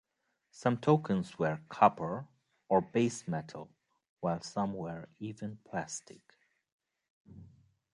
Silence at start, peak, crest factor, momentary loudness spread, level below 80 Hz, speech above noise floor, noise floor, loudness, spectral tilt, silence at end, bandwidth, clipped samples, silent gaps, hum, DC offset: 0.55 s; -8 dBFS; 26 dB; 16 LU; -68 dBFS; 49 dB; -82 dBFS; -33 LUFS; -6.5 dB/octave; 0.45 s; 11 kHz; under 0.1%; 4.09-4.17 s, 6.72-6.79 s, 7.10-7.25 s; none; under 0.1%